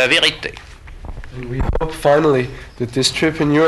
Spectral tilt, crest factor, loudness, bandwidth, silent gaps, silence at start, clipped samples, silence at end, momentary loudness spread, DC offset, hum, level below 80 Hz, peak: -4.5 dB/octave; 14 dB; -17 LUFS; 12 kHz; none; 0 s; under 0.1%; 0 s; 22 LU; under 0.1%; none; -30 dBFS; -2 dBFS